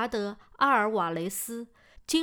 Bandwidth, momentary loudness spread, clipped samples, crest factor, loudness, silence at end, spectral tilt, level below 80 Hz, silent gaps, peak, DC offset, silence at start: over 20 kHz; 18 LU; under 0.1%; 18 dB; -28 LUFS; 0 s; -3.5 dB/octave; -60 dBFS; none; -10 dBFS; under 0.1%; 0 s